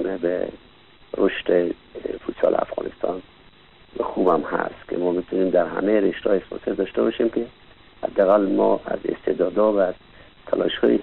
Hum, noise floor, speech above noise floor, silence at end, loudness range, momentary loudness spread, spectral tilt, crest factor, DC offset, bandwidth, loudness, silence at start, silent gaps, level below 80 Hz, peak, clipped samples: none; -51 dBFS; 29 dB; 0 s; 4 LU; 11 LU; -9 dB/octave; 18 dB; 0.2%; 4.2 kHz; -22 LUFS; 0 s; none; -54 dBFS; -6 dBFS; under 0.1%